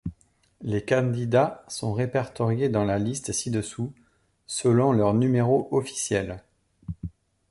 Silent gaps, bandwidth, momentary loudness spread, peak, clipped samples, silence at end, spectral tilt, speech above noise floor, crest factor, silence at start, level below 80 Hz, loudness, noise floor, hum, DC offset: none; 11.5 kHz; 16 LU; -8 dBFS; under 0.1%; 0.4 s; -6 dB/octave; 36 dB; 18 dB; 0.05 s; -52 dBFS; -25 LUFS; -60 dBFS; none; under 0.1%